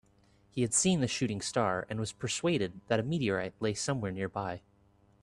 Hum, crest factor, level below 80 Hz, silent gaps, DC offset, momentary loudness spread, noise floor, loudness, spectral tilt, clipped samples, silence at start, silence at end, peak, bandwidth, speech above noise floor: none; 18 dB; -62 dBFS; none; under 0.1%; 9 LU; -65 dBFS; -32 LUFS; -4 dB/octave; under 0.1%; 0.55 s; 0.65 s; -14 dBFS; 12.5 kHz; 34 dB